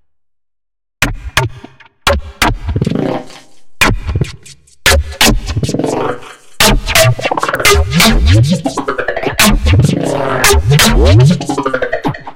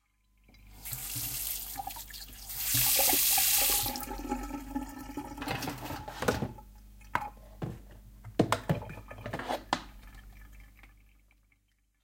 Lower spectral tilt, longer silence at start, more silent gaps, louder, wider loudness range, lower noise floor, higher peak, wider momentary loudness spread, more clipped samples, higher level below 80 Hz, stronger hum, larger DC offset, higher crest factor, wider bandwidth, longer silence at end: first, -4 dB/octave vs -2.5 dB/octave; first, 0.8 s vs 0.6 s; neither; first, -11 LUFS vs -30 LUFS; second, 6 LU vs 11 LU; first, -76 dBFS vs -72 dBFS; first, 0 dBFS vs -10 dBFS; second, 9 LU vs 20 LU; first, 0.2% vs under 0.1%; first, -20 dBFS vs -50 dBFS; second, none vs 50 Hz at -55 dBFS; first, 1% vs under 0.1%; second, 12 dB vs 26 dB; first, over 20 kHz vs 17 kHz; second, 0 s vs 1.1 s